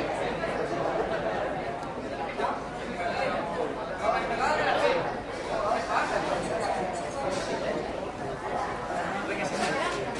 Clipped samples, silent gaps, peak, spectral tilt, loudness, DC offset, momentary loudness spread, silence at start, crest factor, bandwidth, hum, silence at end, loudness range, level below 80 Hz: under 0.1%; none; -10 dBFS; -4.5 dB/octave; -30 LUFS; under 0.1%; 7 LU; 0 s; 20 dB; 11.5 kHz; none; 0 s; 3 LU; -52 dBFS